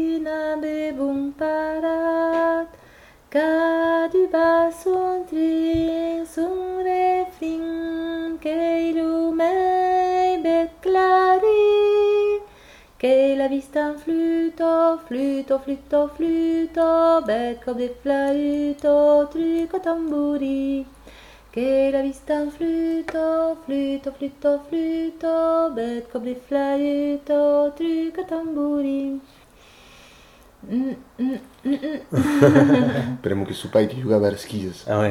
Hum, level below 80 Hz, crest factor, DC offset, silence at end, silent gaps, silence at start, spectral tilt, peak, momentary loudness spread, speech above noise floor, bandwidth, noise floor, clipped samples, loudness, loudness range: none; -52 dBFS; 18 dB; under 0.1%; 0 s; none; 0 s; -7 dB/octave; -2 dBFS; 10 LU; 28 dB; 15 kHz; -50 dBFS; under 0.1%; -21 LUFS; 5 LU